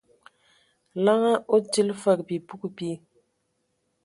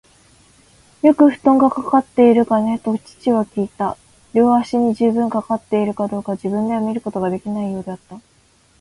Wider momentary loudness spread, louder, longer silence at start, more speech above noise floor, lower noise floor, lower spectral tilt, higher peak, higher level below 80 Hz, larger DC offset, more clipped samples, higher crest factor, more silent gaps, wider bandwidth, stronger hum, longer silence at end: first, 15 LU vs 11 LU; second, -24 LUFS vs -17 LUFS; about the same, 0.95 s vs 1.05 s; first, 51 dB vs 38 dB; first, -74 dBFS vs -55 dBFS; second, -5 dB/octave vs -8 dB/octave; second, -8 dBFS vs 0 dBFS; second, -74 dBFS vs -56 dBFS; neither; neither; about the same, 20 dB vs 18 dB; neither; about the same, 11.5 kHz vs 11.5 kHz; neither; first, 1.1 s vs 0.6 s